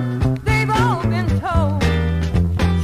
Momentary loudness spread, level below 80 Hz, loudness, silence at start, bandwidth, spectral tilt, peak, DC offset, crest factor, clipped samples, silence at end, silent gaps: 3 LU; -26 dBFS; -18 LUFS; 0 s; 13.5 kHz; -7 dB/octave; -4 dBFS; under 0.1%; 14 dB; under 0.1%; 0 s; none